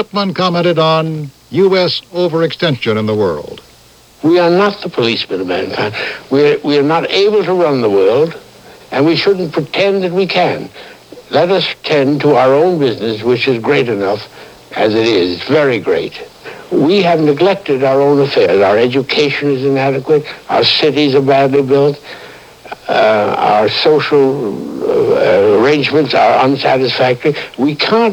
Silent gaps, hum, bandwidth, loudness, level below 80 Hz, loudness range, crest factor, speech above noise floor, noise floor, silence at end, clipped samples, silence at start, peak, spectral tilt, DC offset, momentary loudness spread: none; none; 13.5 kHz; -12 LUFS; -54 dBFS; 3 LU; 12 dB; 31 dB; -43 dBFS; 0 s; under 0.1%; 0 s; 0 dBFS; -6 dB/octave; under 0.1%; 8 LU